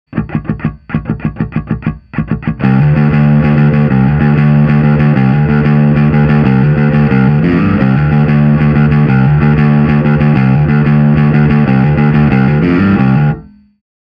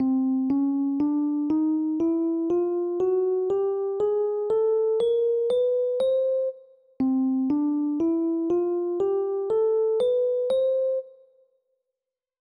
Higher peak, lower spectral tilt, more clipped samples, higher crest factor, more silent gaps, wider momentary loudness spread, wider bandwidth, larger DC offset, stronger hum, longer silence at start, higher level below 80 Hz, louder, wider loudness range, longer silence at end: first, 0 dBFS vs -16 dBFS; first, -11 dB/octave vs -8 dB/octave; neither; about the same, 8 dB vs 8 dB; neither; first, 9 LU vs 3 LU; second, 5.2 kHz vs 10 kHz; neither; neither; about the same, 0.1 s vs 0 s; first, -28 dBFS vs -66 dBFS; first, -10 LUFS vs -24 LUFS; about the same, 2 LU vs 1 LU; second, 0.65 s vs 1.3 s